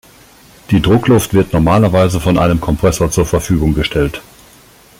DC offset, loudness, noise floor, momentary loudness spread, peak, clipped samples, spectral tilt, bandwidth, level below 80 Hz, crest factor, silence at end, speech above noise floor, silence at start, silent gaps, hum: under 0.1%; -13 LUFS; -43 dBFS; 5 LU; 0 dBFS; under 0.1%; -6 dB/octave; 17 kHz; -28 dBFS; 12 dB; 0.8 s; 31 dB; 0.7 s; none; none